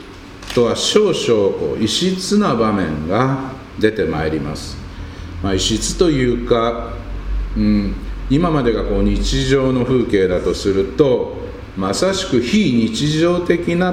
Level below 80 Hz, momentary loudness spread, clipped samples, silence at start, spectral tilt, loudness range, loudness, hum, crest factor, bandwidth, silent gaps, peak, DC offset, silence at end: -28 dBFS; 12 LU; under 0.1%; 0 s; -5 dB/octave; 3 LU; -17 LUFS; none; 16 dB; 16 kHz; none; 0 dBFS; under 0.1%; 0 s